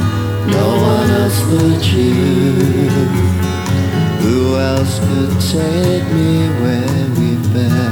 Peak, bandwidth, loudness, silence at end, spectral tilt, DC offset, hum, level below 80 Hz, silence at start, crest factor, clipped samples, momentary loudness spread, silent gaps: -2 dBFS; over 20 kHz; -14 LUFS; 0 s; -6.5 dB/octave; under 0.1%; none; -36 dBFS; 0 s; 12 dB; under 0.1%; 3 LU; none